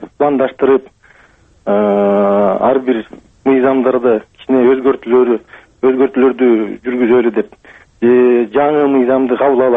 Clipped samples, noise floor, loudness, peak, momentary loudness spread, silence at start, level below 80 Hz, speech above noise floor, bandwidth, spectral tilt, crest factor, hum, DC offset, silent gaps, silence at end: under 0.1%; -48 dBFS; -13 LUFS; 0 dBFS; 7 LU; 0 s; -52 dBFS; 36 dB; 3.8 kHz; -9 dB/octave; 12 dB; none; under 0.1%; none; 0 s